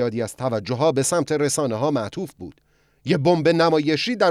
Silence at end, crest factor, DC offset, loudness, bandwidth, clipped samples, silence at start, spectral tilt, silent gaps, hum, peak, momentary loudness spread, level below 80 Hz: 0 s; 16 dB; under 0.1%; -21 LUFS; 14.5 kHz; under 0.1%; 0 s; -5 dB/octave; none; none; -6 dBFS; 15 LU; -60 dBFS